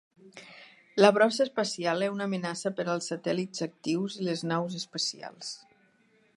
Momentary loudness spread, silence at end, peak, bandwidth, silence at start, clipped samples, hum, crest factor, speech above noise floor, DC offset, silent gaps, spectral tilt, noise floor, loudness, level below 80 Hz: 17 LU; 0.8 s; -4 dBFS; 11.5 kHz; 0.25 s; under 0.1%; none; 26 dB; 37 dB; under 0.1%; none; -4.5 dB/octave; -66 dBFS; -29 LUFS; -80 dBFS